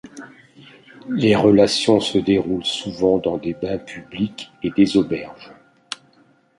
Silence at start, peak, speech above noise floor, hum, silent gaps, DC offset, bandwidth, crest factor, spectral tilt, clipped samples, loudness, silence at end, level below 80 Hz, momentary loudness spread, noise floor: 0.05 s; -2 dBFS; 38 dB; none; none; under 0.1%; 11.5 kHz; 18 dB; -5.5 dB/octave; under 0.1%; -19 LUFS; 1.05 s; -52 dBFS; 19 LU; -56 dBFS